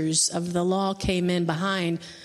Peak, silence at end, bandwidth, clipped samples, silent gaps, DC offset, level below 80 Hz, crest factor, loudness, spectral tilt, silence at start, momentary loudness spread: -10 dBFS; 0 s; 13 kHz; under 0.1%; none; under 0.1%; -48 dBFS; 16 dB; -25 LUFS; -4 dB/octave; 0 s; 4 LU